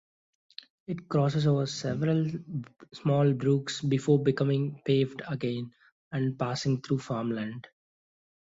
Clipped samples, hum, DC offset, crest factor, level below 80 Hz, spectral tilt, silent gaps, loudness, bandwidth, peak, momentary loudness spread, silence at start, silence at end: under 0.1%; none; under 0.1%; 18 dB; -66 dBFS; -7 dB/octave; 5.92-6.11 s; -29 LUFS; 7.8 kHz; -12 dBFS; 14 LU; 0.9 s; 0.95 s